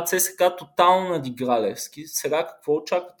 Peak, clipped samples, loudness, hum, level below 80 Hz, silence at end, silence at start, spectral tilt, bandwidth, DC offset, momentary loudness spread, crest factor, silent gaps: -2 dBFS; under 0.1%; -23 LUFS; none; -70 dBFS; 0.1 s; 0 s; -3 dB/octave; 19.5 kHz; under 0.1%; 10 LU; 20 dB; none